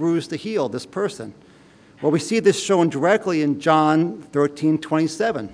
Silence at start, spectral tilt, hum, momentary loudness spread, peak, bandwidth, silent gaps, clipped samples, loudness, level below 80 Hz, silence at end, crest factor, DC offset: 0 s; -5.5 dB/octave; none; 9 LU; -2 dBFS; 10.5 kHz; none; under 0.1%; -20 LUFS; -66 dBFS; 0 s; 18 dB; under 0.1%